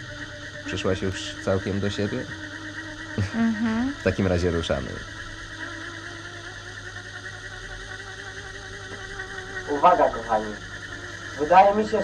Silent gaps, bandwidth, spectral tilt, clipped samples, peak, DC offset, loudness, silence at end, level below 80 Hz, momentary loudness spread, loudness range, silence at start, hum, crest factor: none; 11 kHz; -5.5 dB/octave; under 0.1%; -4 dBFS; under 0.1%; -26 LUFS; 0 s; -46 dBFS; 17 LU; 11 LU; 0 s; none; 22 dB